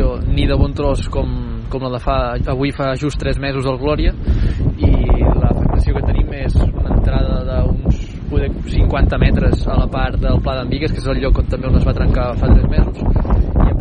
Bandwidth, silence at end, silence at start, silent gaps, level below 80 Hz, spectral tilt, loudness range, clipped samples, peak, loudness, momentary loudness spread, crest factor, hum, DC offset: 9.4 kHz; 0 s; 0 s; none; -16 dBFS; -8 dB/octave; 2 LU; under 0.1%; 0 dBFS; -17 LUFS; 6 LU; 14 dB; none; under 0.1%